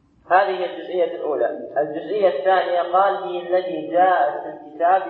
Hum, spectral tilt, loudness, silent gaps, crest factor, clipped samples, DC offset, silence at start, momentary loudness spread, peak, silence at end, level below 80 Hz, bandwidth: none; -7.5 dB/octave; -20 LUFS; none; 18 dB; under 0.1%; under 0.1%; 0.3 s; 8 LU; -2 dBFS; 0 s; -70 dBFS; 4.4 kHz